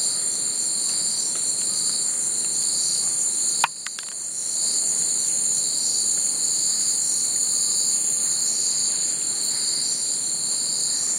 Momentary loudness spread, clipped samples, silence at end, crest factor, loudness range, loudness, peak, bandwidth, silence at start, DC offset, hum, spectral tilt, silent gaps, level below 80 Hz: 3 LU; under 0.1%; 0 s; 20 dB; 2 LU; -20 LUFS; -4 dBFS; 16 kHz; 0 s; under 0.1%; none; 1.5 dB/octave; none; -72 dBFS